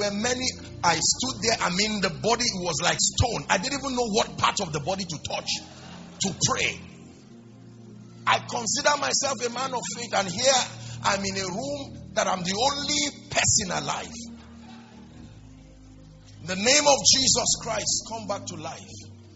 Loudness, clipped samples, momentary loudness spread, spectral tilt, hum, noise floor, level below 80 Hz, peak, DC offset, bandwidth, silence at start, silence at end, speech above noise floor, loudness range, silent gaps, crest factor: -24 LUFS; under 0.1%; 13 LU; -2 dB/octave; none; -48 dBFS; -52 dBFS; -4 dBFS; under 0.1%; 8.2 kHz; 0 s; 0 s; 22 dB; 6 LU; none; 24 dB